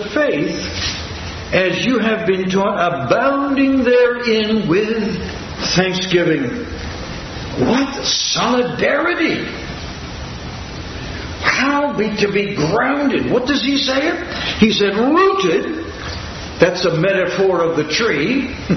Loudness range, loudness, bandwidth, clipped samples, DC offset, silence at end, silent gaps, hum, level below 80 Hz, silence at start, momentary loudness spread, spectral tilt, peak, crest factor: 4 LU; -16 LUFS; 6.4 kHz; under 0.1%; under 0.1%; 0 s; none; none; -38 dBFS; 0 s; 13 LU; -4.5 dB/octave; 0 dBFS; 16 dB